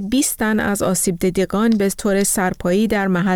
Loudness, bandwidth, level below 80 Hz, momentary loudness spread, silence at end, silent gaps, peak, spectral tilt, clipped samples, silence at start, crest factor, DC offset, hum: -18 LUFS; 18.5 kHz; -42 dBFS; 2 LU; 0 s; none; -6 dBFS; -4.5 dB/octave; under 0.1%; 0 s; 10 dB; 0.2%; none